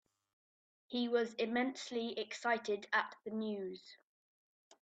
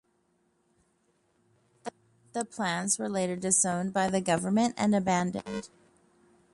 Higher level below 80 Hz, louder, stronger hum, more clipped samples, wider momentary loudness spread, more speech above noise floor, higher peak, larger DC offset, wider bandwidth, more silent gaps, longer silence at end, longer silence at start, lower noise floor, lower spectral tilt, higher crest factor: second, -86 dBFS vs -66 dBFS; second, -38 LUFS vs -28 LUFS; neither; neither; second, 8 LU vs 15 LU; first, over 52 dB vs 43 dB; second, -20 dBFS vs -10 dBFS; neither; second, 8.8 kHz vs 11.5 kHz; neither; about the same, 0.85 s vs 0.9 s; second, 0.9 s vs 1.85 s; first, under -90 dBFS vs -72 dBFS; about the same, -4 dB/octave vs -4 dB/octave; about the same, 20 dB vs 20 dB